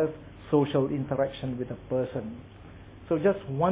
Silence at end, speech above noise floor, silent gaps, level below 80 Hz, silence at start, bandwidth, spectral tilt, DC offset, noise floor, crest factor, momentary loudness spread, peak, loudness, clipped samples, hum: 0 s; 19 dB; none; -52 dBFS; 0 s; 4 kHz; -11.5 dB/octave; under 0.1%; -47 dBFS; 18 dB; 22 LU; -10 dBFS; -29 LUFS; under 0.1%; none